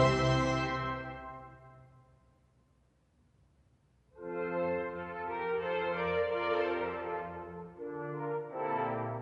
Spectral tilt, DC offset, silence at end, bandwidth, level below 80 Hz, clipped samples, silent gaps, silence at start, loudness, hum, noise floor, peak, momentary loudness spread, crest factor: -6 dB/octave; under 0.1%; 0 s; 9 kHz; -56 dBFS; under 0.1%; none; 0 s; -35 LUFS; none; -70 dBFS; -14 dBFS; 14 LU; 22 dB